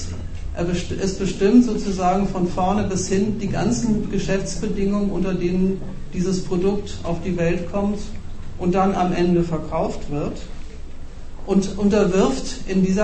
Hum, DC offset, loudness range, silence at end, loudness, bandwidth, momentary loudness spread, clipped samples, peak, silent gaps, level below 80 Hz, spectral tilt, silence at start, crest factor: none; under 0.1%; 3 LU; 0 s; -21 LUFS; 8.8 kHz; 14 LU; under 0.1%; -4 dBFS; none; -32 dBFS; -6.5 dB/octave; 0 s; 18 dB